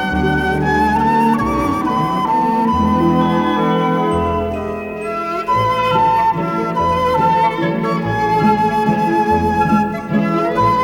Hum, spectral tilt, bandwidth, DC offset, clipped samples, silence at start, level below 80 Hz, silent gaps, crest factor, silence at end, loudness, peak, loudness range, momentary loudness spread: none; -7 dB/octave; 17.5 kHz; under 0.1%; under 0.1%; 0 s; -38 dBFS; none; 14 dB; 0 s; -16 LUFS; -2 dBFS; 2 LU; 5 LU